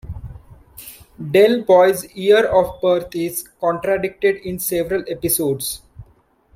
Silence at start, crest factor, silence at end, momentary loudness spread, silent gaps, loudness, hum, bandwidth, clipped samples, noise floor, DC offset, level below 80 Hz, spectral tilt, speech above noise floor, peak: 0.05 s; 16 dB; 0.55 s; 21 LU; none; -18 LUFS; none; 16.5 kHz; under 0.1%; -55 dBFS; under 0.1%; -46 dBFS; -4 dB/octave; 38 dB; -2 dBFS